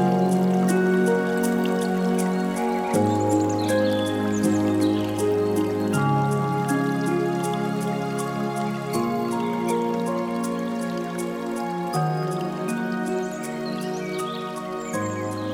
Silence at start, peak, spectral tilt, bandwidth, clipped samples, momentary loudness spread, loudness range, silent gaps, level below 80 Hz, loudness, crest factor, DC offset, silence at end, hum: 0 s; -10 dBFS; -6 dB/octave; 18 kHz; under 0.1%; 8 LU; 5 LU; none; -58 dBFS; -24 LUFS; 14 dB; under 0.1%; 0 s; none